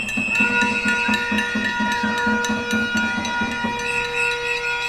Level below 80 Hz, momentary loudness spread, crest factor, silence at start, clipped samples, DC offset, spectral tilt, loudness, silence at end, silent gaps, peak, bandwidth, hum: -46 dBFS; 5 LU; 16 dB; 0 s; under 0.1%; under 0.1%; -3 dB/octave; -20 LUFS; 0 s; none; -6 dBFS; 14.5 kHz; none